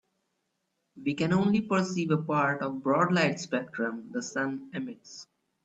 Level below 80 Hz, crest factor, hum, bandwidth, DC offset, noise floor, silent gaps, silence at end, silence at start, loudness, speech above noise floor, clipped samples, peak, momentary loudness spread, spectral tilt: -68 dBFS; 18 dB; none; 8.2 kHz; under 0.1%; -79 dBFS; none; 0.4 s; 0.95 s; -29 LUFS; 51 dB; under 0.1%; -12 dBFS; 13 LU; -6 dB/octave